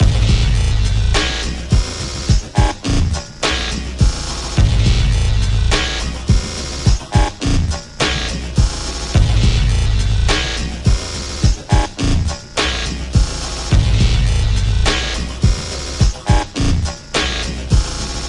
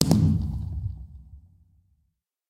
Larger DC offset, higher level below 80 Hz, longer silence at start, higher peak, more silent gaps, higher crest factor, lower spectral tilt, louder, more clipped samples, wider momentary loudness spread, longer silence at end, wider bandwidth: neither; first, -18 dBFS vs -40 dBFS; about the same, 0 s vs 0 s; about the same, 0 dBFS vs 0 dBFS; neither; second, 14 dB vs 28 dB; second, -4.5 dB/octave vs -6.5 dB/octave; first, -17 LUFS vs -26 LUFS; neither; second, 6 LU vs 25 LU; second, 0 s vs 1.1 s; second, 11.5 kHz vs 16.5 kHz